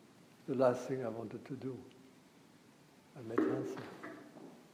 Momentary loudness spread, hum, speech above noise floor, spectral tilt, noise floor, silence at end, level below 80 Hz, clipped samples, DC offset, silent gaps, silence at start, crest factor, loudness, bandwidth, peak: 21 LU; none; 26 dB; -7 dB/octave; -63 dBFS; 0.05 s; -84 dBFS; under 0.1%; under 0.1%; none; 0 s; 22 dB; -38 LUFS; 15.5 kHz; -18 dBFS